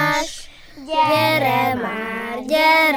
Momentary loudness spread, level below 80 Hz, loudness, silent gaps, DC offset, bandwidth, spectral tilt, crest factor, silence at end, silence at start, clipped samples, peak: 11 LU; -48 dBFS; -18 LUFS; none; under 0.1%; 18.5 kHz; -4 dB/octave; 16 dB; 0 s; 0 s; under 0.1%; -4 dBFS